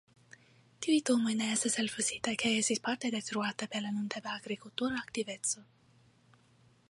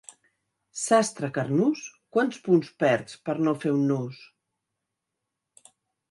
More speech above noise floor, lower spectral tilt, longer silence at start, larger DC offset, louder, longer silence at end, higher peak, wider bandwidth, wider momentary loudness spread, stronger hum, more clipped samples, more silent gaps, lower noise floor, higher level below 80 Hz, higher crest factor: second, 32 dB vs 59 dB; second, -2.5 dB/octave vs -5.5 dB/octave; about the same, 0.8 s vs 0.75 s; neither; second, -33 LUFS vs -25 LUFS; second, 1.25 s vs 1.85 s; second, -14 dBFS vs -8 dBFS; about the same, 11.5 kHz vs 11.5 kHz; about the same, 9 LU vs 10 LU; neither; neither; neither; second, -66 dBFS vs -84 dBFS; about the same, -74 dBFS vs -74 dBFS; about the same, 20 dB vs 20 dB